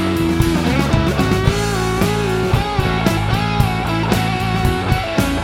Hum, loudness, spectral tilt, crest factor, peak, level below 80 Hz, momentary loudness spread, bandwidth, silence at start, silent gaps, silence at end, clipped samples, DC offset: none; -17 LUFS; -6 dB/octave; 16 dB; 0 dBFS; -26 dBFS; 2 LU; 17 kHz; 0 s; none; 0 s; under 0.1%; under 0.1%